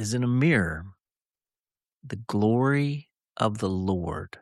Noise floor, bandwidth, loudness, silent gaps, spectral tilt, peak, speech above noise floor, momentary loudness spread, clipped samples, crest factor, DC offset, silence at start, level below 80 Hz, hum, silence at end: under -90 dBFS; 12.5 kHz; -26 LUFS; 1.93-1.97 s; -6.5 dB/octave; -10 dBFS; over 65 dB; 16 LU; under 0.1%; 18 dB; under 0.1%; 0 s; -52 dBFS; none; 0.15 s